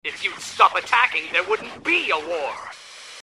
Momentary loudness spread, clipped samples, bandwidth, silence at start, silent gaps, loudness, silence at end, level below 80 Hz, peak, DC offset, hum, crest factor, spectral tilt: 18 LU; under 0.1%; 14 kHz; 0.05 s; none; -21 LUFS; 0.05 s; -68 dBFS; -2 dBFS; under 0.1%; none; 22 dB; -1 dB/octave